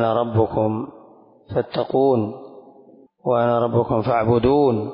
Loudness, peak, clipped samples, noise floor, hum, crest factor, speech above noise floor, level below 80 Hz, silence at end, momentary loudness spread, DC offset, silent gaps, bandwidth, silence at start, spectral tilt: -20 LUFS; -6 dBFS; under 0.1%; -49 dBFS; none; 14 dB; 30 dB; -46 dBFS; 0 s; 12 LU; under 0.1%; none; 5.4 kHz; 0 s; -12.5 dB/octave